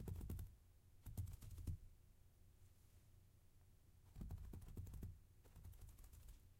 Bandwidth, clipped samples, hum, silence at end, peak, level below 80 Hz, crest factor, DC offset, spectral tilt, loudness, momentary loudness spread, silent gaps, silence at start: 16 kHz; under 0.1%; none; 0 s; -38 dBFS; -60 dBFS; 20 dB; under 0.1%; -6.5 dB/octave; -57 LUFS; 11 LU; none; 0 s